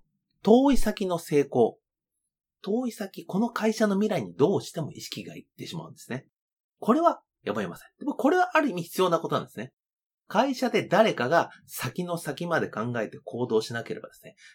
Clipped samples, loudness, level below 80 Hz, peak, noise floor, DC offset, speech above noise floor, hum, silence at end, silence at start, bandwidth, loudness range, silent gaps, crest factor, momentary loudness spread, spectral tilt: under 0.1%; -26 LUFS; -46 dBFS; -6 dBFS; -85 dBFS; under 0.1%; 59 dB; none; 0.25 s; 0.45 s; 18.5 kHz; 4 LU; 6.33-6.69 s, 9.73-9.77 s, 10.06-10.18 s; 22 dB; 16 LU; -5.5 dB/octave